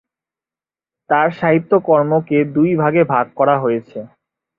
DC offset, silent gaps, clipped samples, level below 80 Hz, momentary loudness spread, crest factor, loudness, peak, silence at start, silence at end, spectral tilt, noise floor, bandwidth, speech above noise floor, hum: under 0.1%; none; under 0.1%; -60 dBFS; 6 LU; 16 dB; -15 LUFS; -2 dBFS; 1.1 s; 0.5 s; -10.5 dB/octave; under -90 dBFS; 5.2 kHz; over 75 dB; none